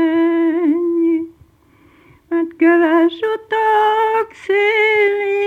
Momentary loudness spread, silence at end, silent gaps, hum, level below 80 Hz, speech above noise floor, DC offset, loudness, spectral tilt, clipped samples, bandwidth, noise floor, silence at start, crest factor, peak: 8 LU; 0 s; none; none; -60 dBFS; 37 dB; under 0.1%; -15 LUFS; -5 dB/octave; under 0.1%; 4.5 kHz; -51 dBFS; 0 s; 14 dB; -2 dBFS